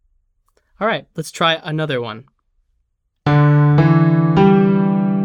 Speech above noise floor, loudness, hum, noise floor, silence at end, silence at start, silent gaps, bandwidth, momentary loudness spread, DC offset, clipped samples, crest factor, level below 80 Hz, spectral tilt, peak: 47 dB; -15 LUFS; none; -68 dBFS; 0 s; 0.8 s; none; 11 kHz; 12 LU; under 0.1%; under 0.1%; 14 dB; -46 dBFS; -7.5 dB/octave; 0 dBFS